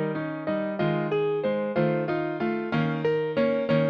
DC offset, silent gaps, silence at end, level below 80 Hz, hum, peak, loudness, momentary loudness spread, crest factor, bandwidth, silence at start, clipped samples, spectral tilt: under 0.1%; none; 0 s; -62 dBFS; none; -12 dBFS; -26 LUFS; 4 LU; 14 dB; 6.2 kHz; 0 s; under 0.1%; -9 dB/octave